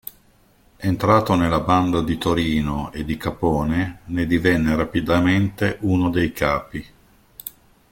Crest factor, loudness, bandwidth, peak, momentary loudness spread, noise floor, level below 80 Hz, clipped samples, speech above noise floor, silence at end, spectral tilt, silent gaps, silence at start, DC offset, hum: 18 dB; -20 LUFS; 17 kHz; -2 dBFS; 12 LU; -56 dBFS; -40 dBFS; under 0.1%; 36 dB; 0.4 s; -7 dB/octave; none; 0.05 s; under 0.1%; none